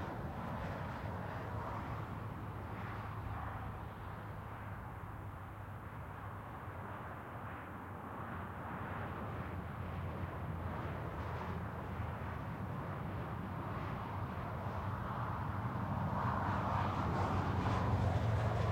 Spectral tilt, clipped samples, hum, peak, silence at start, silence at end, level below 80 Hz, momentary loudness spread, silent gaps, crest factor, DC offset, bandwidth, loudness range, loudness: -8 dB/octave; under 0.1%; none; -24 dBFS; 0 s; 0 s; -54 dBFS; 11 LU; none; 16 dB; under 0.1%; 16.5 kHz; 10 LU; -42 LUFS